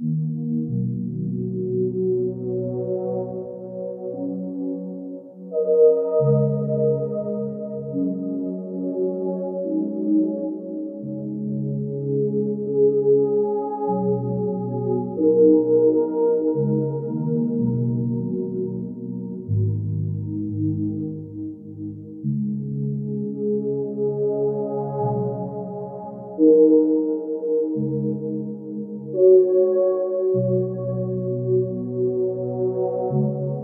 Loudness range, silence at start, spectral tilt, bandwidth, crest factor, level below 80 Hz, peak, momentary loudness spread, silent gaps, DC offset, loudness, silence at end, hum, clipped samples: 7 LU; 0 s; -16 dB/octave; 1.8 kHz; 16 dB; -60 dBFS; -6 dBFS; 14 LU; none; under 0.1%; -23 LUFS; 0 s; none; under 0.1%